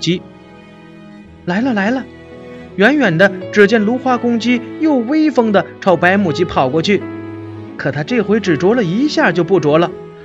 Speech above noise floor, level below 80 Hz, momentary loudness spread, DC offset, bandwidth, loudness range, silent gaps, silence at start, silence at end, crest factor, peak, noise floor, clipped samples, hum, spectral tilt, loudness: 25 dB; -50 dBFS; 17 LU; under 0.1%; 8.2 kHz; 3 LU; none; 0 s; 0 s; 14 dB; 0 dBFS; -38 dBFS; under 0.1%; none; -6 dB/octave; -14 LUFS